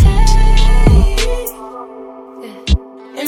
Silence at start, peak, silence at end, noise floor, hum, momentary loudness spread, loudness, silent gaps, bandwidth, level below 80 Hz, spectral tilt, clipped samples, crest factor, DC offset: 0 s; 0 dBFS; 0 s; -32 dBFS; none; 21 LU; -14 LUFS; none; 17 kHz; -12 dBFS; -5.5 dB/octave; under 0.1%; 12 dB; under 0.1%